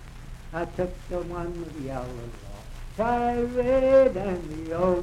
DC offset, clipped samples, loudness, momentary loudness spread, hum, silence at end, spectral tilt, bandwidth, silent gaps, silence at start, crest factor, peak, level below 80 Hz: under 0.1%; under 0.1%; -26 LUFS; 22 LU; none; 0 s; -7.5 dB/octave; 12 kHz; none; 0 s; 18 dB; -8 dBFS; -40 dBFS